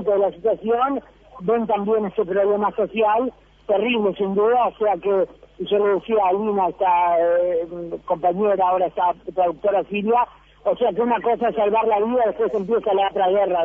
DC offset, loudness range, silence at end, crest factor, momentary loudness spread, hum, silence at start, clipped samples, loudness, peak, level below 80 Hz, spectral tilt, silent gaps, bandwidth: under 0.1%; 1 LU; 0 s; 12 dB; 5 LU; none; 0 s; under 0.1%; -20 LUFS; -8 dBFS; -54 dBFS; -8.5 dB/octave; none; 3.7 kHz